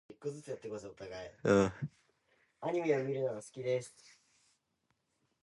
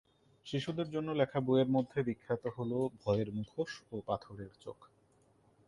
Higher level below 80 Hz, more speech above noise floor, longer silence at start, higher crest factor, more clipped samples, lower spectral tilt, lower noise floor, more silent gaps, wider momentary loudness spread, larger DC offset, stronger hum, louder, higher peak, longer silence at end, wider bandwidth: about the same, -66 dBFS vs -66 dBFS; first, 45 dB vs 34 dB; second, 0.1 s vs 0.45 s; about the same, 22 dB vs 20 dB; neither; about the same, -6.5 dB/octave vs -7.5 dB/octave; first, -81 dBFS vs -69 dBFS; neither; about the same, 17 LU vs 17 LU; neither; neither; about the same, -36 LUFS vs -36 LUFS; about the same, -16 dBFS vs -16 dBFS; first, 1.5 s vs 0.85 s; about the same, 11.5 kHz vs 11.5 kHz